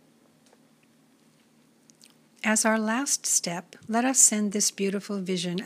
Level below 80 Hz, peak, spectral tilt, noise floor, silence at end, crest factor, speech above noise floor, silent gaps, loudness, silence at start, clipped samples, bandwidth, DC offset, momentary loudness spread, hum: -82 dBFS; -6 dBFS; -2.5 dB/octave; -61 dBFS; 0 s; 22 dB; 36 dB; none; -24 LUFS; 2.45 s; under 0.1%; 15.5 kHz; under 0.1%; 13 LU; none